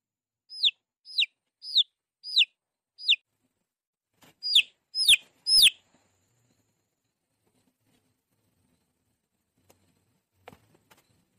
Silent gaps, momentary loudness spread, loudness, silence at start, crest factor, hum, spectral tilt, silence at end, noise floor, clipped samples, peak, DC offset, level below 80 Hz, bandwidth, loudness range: 3.87-3.93 s; 15 LU; -23 LUFS; 0.5 s; 20 dB; none; 4 dB/octave; 5.65 s; -80 dBFS; under 0.1%; -12 dBFS; under 0.1%; -68 dBFS; 15.5 kHz; 4 LU